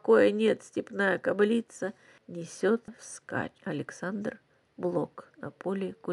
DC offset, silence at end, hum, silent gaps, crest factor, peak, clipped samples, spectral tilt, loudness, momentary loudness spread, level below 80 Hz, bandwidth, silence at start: under 0.1%; 0 s; none; none; 20 dB; -10 dBFS; under 0.1%; -5.5 dB/octave; -30 LUFS; 16 LU; -74 dBFS; 11.5 kHz; 0.05 s